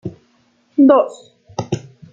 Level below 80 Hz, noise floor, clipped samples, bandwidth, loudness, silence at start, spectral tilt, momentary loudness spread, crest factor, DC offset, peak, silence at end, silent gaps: -58 dBFS; -58 dBFS; under 0.1%; 7.8 kHz; -16 LUFS; 0.05 s; -7.5 dB/octave; 19 LU; 16 dB; under 0.1%; -2 dBFS; 0.35 s; none